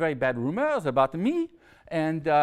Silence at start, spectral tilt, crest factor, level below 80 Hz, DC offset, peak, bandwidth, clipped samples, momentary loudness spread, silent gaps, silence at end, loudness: 0 s; -7.5 dB/octave; 18 dB; -62 dBFS; under 0.1%; -8 dBFS; 12.5 kHz; under 0.1%; 7 LU; none; 0 s; -27 LUFS